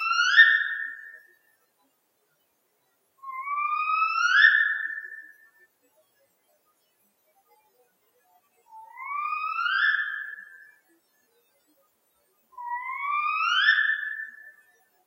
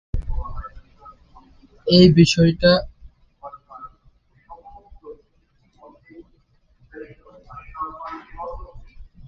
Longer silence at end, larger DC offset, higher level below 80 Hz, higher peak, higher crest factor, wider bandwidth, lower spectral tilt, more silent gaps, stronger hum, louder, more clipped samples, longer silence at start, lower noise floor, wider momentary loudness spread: first, 0.55 s vs 0.25 s; neither; second, under -90 dBFS vs -38 dBFS; second, -4 dBFS vs 0 dBFS; about the same, 24 dB vs 22 dB; first, 16 kHz vs 7.6 kHz; second, 5 dB/octave vs -6 dB/octave; neither; neither; second, -23 LUFS vs -17 LUFS; neither; second, 0 s vs 0.15 s; first, -71 dBFS vs -61 dBFS; second, 23 LU vs 29 LU